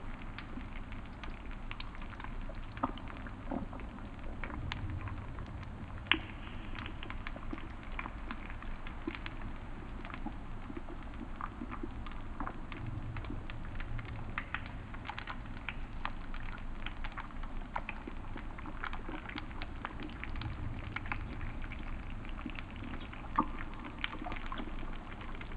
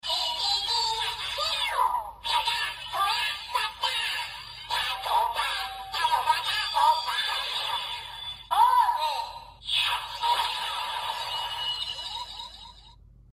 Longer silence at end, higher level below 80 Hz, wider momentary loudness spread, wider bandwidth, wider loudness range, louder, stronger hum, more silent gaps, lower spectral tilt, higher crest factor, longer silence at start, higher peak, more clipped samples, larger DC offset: second, 0 s vs 0.4 s; first, -44 dBFS vs -56 dBFS; second, 6 LU vs 11 LU; second, 5 kHz vs 15 kHz; about the same, 5 LU vs 3 LU; second, -43 LUFS vs -27 LUFS; neither; neither; first, -6.5 dB/octave vs 0.5 dB/octave; first, 34 dB vs 20 dB; about the same, 0 s vs 0.05 s; first, -6 dBFS vs -10 dBFS; neither; neither